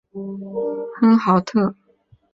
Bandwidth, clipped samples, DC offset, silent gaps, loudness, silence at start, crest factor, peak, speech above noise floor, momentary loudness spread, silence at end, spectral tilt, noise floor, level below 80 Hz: 7.4 kHz; under 0.1%; under 0.1%; none; -19 LUFS; 0.15 s; 16 dB; -4 dBFS; 39 dB; 14 LU; 0.6 s; -8 dB/octave; -57 dBFS; -60 dBFS